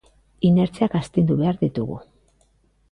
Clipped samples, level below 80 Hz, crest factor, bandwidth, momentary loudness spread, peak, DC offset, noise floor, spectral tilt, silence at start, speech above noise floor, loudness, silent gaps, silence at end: under 0.1%; -50 dBFS; 16 dB; 10.5 kHz; 11 LU; -6 dBFS; under 0.1%; -61 dBFS; -9 dB/octave; 0.4 s; 42 dB; -21 LUFS; none; 0.9 s